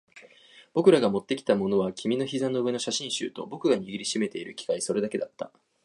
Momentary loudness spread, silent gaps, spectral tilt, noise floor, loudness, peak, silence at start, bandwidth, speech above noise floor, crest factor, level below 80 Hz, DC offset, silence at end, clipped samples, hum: 11 LU; none; -4.5 dB/octave; -54 dBFS; -27 LUFS; -6 dBFS; 0.15 s; 11.5 kHz; 28 dB; 22 dB; -70 dBFS; under 0.1%; 0.35 s; under 0.1%; none